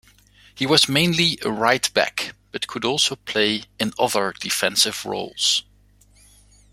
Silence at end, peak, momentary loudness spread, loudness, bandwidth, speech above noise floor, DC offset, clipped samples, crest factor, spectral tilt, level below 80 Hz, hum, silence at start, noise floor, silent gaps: 1.1 s; -2 dBFS; 11 LU; -20 LUFS; 16.5 kHz; 33 dB; under 0.1%; under 0.1%; 22 dB; -2.5 dB/octave; -56 dBFS; 50 Hz at -55 dBFS; 0.55 s; -55 dBFS; none